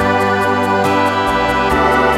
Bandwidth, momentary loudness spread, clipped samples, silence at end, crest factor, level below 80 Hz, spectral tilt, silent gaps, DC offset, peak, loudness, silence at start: 16.5 kHz; 2 LU; under 0.1%; 0 s; 12 dB; -32 dBFS; -5.5 dB/octave; none; under 0.1%; -2 dBFS; -14 LUFS; 0 s